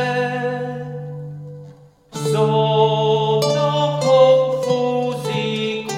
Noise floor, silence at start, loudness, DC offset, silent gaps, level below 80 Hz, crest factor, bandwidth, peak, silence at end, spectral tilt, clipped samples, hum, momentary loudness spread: -44 dBFS; 0 s; -18 LUFS; under 0.1%; none; -60 dBFS; 18 dB; 15.5 kHz; 0 dBFS; 0 s; -5.5 dB/octave; under 0.1%; none; 18 LU